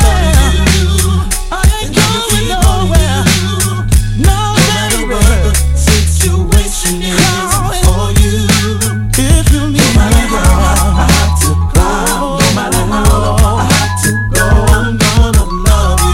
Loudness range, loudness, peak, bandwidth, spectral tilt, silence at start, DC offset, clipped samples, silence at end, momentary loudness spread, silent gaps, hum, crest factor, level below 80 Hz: 1 LU; -10 LUFS; 0 dBFS; 16.5 kHz; -4.5 dB/octave; 0 s; under 0.1%; 0.7%; 0 s; 3 LU; none; none; 10 dB; -12 dBFS